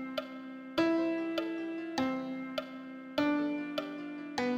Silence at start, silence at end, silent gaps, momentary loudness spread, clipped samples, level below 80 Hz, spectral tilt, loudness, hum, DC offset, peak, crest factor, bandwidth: 0 s; 0 s; none; 11 LU; under 0.1%; -72 dBFS; -5 dB/octave; -35 LUFS; none; under 0.1%; -16 dBFS; 18 dB; 14.5 kHz